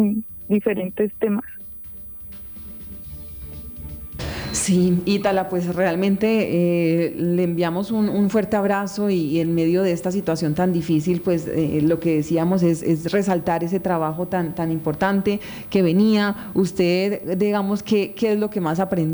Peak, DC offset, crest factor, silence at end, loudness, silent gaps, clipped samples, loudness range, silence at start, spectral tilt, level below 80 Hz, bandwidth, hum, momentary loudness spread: -6 dBFS; under 0.1%; 14 dB; 0 s; -21 LUFS; none; under 0.1%; 6 LU; 0 s; -6.5 dB/octave; -48 dBFS; over 20 kHz; none; 14 LU